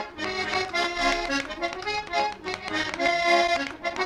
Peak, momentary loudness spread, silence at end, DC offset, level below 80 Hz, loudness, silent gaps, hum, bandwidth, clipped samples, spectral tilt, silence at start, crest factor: -8 dBFS; 9 LU; 0 s; under 0.1%; -50 dBFS; -26 LUFS; none; none; 13.5 kHz; under 0.1%; -2.5 dB/octave; 0 s; 18 dB